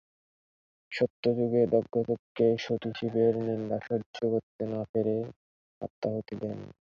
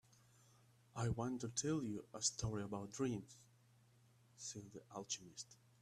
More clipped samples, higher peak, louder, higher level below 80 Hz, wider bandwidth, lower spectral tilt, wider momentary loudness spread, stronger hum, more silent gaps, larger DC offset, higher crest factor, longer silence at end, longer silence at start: neither; first, -12 dBFS vs -24 dBFS; first, -30 LUFS vs -45 LUFS; about the same, -66 dBFS vs -68 dBFS; second, 7.2 kHz vs 14 kHz; first, -8 dB/octave vs -4.5 dB/octave; second, 11 LU vs 14 LU; neither; first, 1.10-1.23 s, 2.19-2.35 s, 4.06-4.13 s, 4.43-4.59 s, 4.89-4.94 s, 5.36-5.81 s, 5.90-6.02 s vs none; neither; about the same, 20 dB vs 24 dB; about the same, 0.15 s vs 0.25 s; about the same, 0.9 s vs 0.95 s